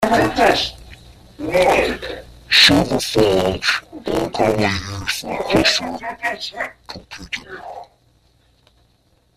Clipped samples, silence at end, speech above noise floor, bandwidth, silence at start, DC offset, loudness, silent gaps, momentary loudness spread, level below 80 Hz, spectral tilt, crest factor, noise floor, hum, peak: under 0.1%; 1.5 s; 41 dB; 15.5 kHz; 0 s; under 0.1%; -17 LUFS; none; 20 LU; -42 dBFS; -3.5 dB/octave; 20 dB; -59 dBFS; none; 0 dBFS